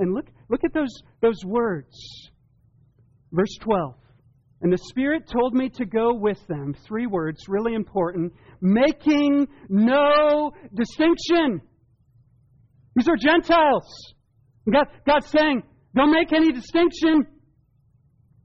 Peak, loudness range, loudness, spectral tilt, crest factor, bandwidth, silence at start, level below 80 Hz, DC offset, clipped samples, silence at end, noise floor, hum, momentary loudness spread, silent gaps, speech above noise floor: -8 dBFS; 7 LU; -22 LUFS; -4.5 dB/octave; 14 dB; 7.4 kHz; 0 s; -50 dBFS; under 0.1%; under 0.1%; 1.2 s; -61 dBFS; none; 12 LU; none; 40 dB